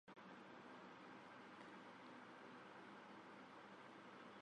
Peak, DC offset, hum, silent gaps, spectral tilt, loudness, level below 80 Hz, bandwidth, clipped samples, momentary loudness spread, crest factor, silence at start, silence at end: -46 dBFS; under 0.1%; none; none; -5 dB/octave; -60 LUFS; under -90 dBFS; 10 kHz; under 0.1%; 1 LU; 14 dB; 0.05 s; 0 s